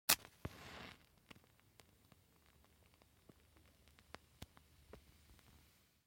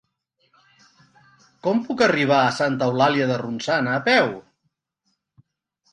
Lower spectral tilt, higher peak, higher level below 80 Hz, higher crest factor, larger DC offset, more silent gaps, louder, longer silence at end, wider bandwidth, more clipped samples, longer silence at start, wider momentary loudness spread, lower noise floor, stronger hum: second, -0.5 dB/octave vs -5.5 dB/octave; second, -10 dBFS vs -4 dBFS; about the same, -70 dBFS vs -66 dBFS; first, 40 dB vs 20 dB; neither; neither; second, -43 LUFS vs -20 LUFS; second, 0.7 s vs 1.5 s; first, 16.5 kHz vs 10.5 kHz; neither; second, 0.1 s vs 1.65 s; first, 16 LU vs 8 LU; about the same, -71 dBFS vs -74 dBFS; neither